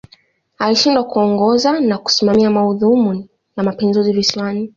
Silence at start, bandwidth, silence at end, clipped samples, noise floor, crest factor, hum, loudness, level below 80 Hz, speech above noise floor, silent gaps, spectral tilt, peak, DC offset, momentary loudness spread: 0.6 s; 7.4 kHz; 0.1 s; under 0.1%; -52 dBFS; 14 dB; none; -15 LUFS; -54 dBFS; 38 dB; none; -5 dB/octave; 0 dBFS; under 0.1%; 8 LU